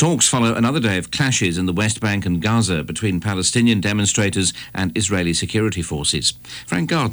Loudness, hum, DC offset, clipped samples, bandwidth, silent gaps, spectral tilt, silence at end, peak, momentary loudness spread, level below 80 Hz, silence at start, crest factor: -19 LUFS; none; under 0.1%; under 0.1%; over 20 kHz; none; -4 dB/octave; 0 s; -6 dBFS; 6 LU; -44 dBFS; 0 s; 14 dB